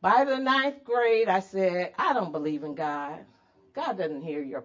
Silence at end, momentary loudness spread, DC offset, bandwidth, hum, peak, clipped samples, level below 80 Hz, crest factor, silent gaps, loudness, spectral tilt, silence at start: 0 s; 11 LU; under 0.1%; 7.6 kHz; none; -10 dBFS; under 0.1%; -74 dBFS; 18 dB; none; -27 LUFS; -5.5 dB/octave; 0 s